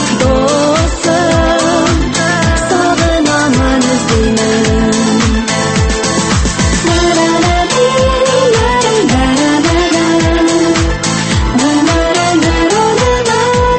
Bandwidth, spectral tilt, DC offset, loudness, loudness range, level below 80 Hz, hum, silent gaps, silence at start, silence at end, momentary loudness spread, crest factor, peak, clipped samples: 8.8 kHz; -4.5 dB/octave; under 0.1%; -10 LUFS; 1 LU; -20 dBFS; none; none; 0 s; 0 s; 2 LU; 10 dB; 0 dBFS; under 0.1%